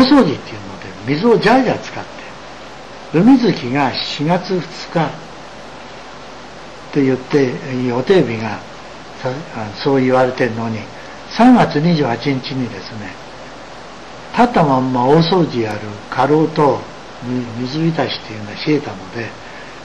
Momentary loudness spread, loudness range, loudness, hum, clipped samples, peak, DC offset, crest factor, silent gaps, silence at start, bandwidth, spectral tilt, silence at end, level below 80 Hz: 21 LU; 5 LU; -16 LUFS; none; under 0.1%; -2 dBFS; 0.9%; 14 dB; none; 0 s; 9.2 kHz; -6.5 dB/octave; 0 s; -48 dBFS